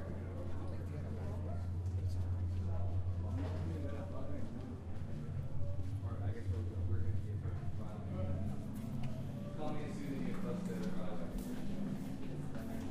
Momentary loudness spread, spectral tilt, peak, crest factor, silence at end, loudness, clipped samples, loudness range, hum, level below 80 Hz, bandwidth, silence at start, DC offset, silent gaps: 5 LU; -8.5 dB/octave; -26 dBFS; 14 dB; 0 s; -42 LUFS; under 0.1%; 2 LU; none; -50 dBFS; 13.5 kHz; 0 s; under 0.1%; none